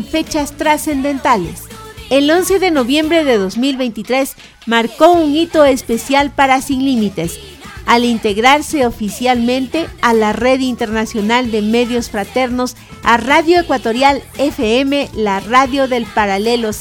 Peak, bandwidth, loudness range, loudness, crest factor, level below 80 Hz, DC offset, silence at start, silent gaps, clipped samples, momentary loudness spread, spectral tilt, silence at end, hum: 0 dBFS; 19 kHz; 2 LU; -14 LUFS; 14 dB; -38 dBFS; under 0.1%; 0 s; none; 0.1%; 8 LU; -4 dB/octave; 0 s; none